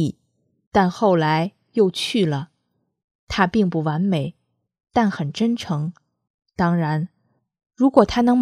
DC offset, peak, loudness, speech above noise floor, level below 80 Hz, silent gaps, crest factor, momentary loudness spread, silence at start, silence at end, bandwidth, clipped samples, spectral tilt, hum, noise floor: under 0.1%; 0 dBFS; -21 LUFS; 53 dB; -50 dBFS; 0.67-0.71 s, 3.04-3.27 s, 6.30-6.39 s; 22 dB; 11 LU; 0 s; 0 s; 13.5 kHz; under 0.1%; -6.5 dB/octave; none; -72 dBFS